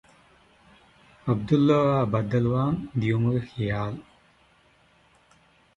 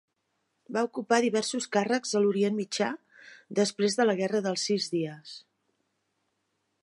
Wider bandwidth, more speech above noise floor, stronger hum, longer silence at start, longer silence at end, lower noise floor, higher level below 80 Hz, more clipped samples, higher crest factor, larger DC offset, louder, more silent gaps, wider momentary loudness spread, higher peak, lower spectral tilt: second, 7.4 kHz vs 11.5 kHz; second, 37 dB vs 51 dB; neither; first, 1.25 s vs 0.7 s; first, 1.75 s vs 1.45 s; second, -60 dBFS vs -78 dBFS; first, -52 dBFS vs -80 dBFS; neither; about the same, 18 dB vs 20 dB; neither; first, -25 LUFS vs -28 LUFS; neither; about the same, 10 LU vs 10 LU; about the same, -8 dBFS vs -10 dBFS; first, -9 dB/octave vs -4 dB/octave